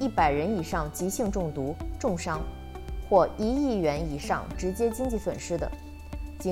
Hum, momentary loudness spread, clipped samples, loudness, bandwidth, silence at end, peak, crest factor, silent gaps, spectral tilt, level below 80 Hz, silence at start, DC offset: none; 15 LU; under 0.1%; -29 LUFS; 16 kHz; 0 s; -8 dBFS; 20 dB; none; -6 dB/octave; -40 dBFS; 0 s; under 0.1%